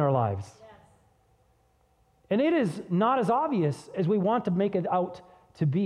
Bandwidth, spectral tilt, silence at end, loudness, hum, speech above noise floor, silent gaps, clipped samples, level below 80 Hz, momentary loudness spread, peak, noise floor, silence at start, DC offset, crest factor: 11 kHz; -8.5 dB/octave; 0 s; -27 LUFS; none; 40 dB; none; under 0.1%; -66 dBFS; 8 LU; -12 dBFS; -66 dBFS; 0 s; under 0.1%; 16 dB